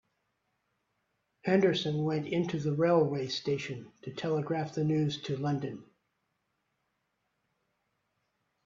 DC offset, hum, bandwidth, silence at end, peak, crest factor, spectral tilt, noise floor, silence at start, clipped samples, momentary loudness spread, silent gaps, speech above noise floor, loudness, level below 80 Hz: under 0.1%; none; 7.6 kHz; 2.85 s; -12 dBFS; 20 dB; -7 dB/octave; -80 dBFS; 1.45 s; under 0.1%; 13 LU; none; 50 dB; -31 LUFS; -72 dBFS